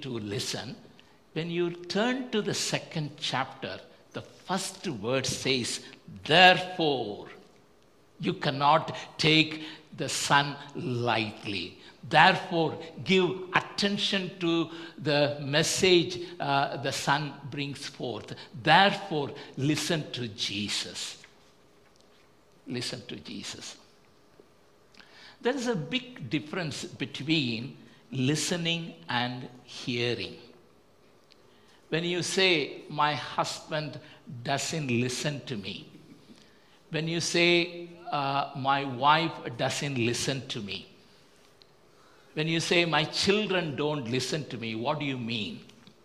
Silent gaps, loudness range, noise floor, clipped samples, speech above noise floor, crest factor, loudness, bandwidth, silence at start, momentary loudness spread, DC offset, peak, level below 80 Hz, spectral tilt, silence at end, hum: none; 9 LU; -61 dBFS; under 0.1%; 33 dB; 26 dB; -28 LUFS; 14.5 kHz; 0 s; 16 LU; under 0.1%; -4 dBFS; -66 dBFS; -4 dB/octave; 0.4 s; none